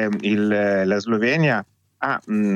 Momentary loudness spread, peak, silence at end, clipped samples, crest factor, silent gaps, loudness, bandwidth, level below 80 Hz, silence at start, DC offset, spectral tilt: 7 LU; -8 dBFS; 0 s; under 0.1%; 14 dB; none; -21 LUFS; 7.4 kHz; -70 dBFS; 0 s; under 0.1%; -7 dB/octave